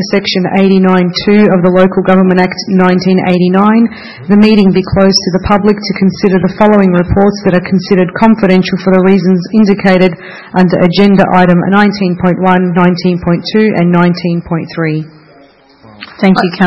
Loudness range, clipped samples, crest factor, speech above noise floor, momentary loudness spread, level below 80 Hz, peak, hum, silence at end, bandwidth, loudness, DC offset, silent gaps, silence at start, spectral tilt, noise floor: 2 LU; 1%; 8 dB; 33 dB; 6 LU; -34 dBFS; 0 dBFS; none; 0 s; 6 kHz; -9 LUFS; 1%; none; 0 s; -7.5 dB/octave; -41 dBFS